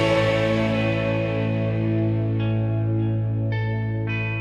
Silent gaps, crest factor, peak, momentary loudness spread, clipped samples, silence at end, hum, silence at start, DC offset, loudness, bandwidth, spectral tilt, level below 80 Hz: none; 14 dB; -8 dBFS; 5 LU; under 0.1%; 0 s; none; 0 s; under 0.1%; -23 LUFS; 7.4 kHz; -8 dB/octave; -44 dBFS